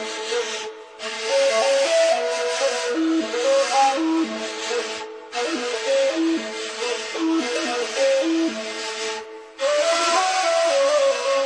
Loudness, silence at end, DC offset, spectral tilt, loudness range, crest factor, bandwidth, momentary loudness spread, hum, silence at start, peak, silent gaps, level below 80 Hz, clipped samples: -21 LUFS; 0 s; under 0.1%; -1 dB/octave; 4 LU; 14 dB; 10.5 kHz; 9 LU; none; 0 s; -8 dBFS; none; -70 dBFS; under 0.1%